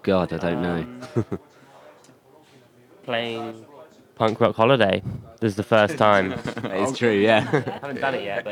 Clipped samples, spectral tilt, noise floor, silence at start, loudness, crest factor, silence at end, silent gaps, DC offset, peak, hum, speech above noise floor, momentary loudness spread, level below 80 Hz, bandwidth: under 0.1%; -6 dB/octave; -53 dBFS; 0.05 s; -22 LUFS; 20 dB; 0 s; none; under 0.1%; -2 dBFS; none; 31 dB; 14 LU; -58 dBFS; 15.5 kHz